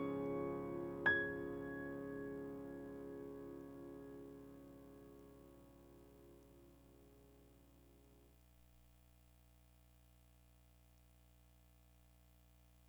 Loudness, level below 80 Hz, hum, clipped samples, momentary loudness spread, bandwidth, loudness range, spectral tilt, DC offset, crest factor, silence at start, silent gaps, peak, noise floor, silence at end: -45 LUFS; -70 dBFS; 60 Hz at -70 dBFS; under 0.1%; 28 LU; over 20 kHz; 26 LU; -6.5 dB/octave; under 0.1%; 26 dB; 0 s; none; -24 dBFS; -68 dBFS; 0 s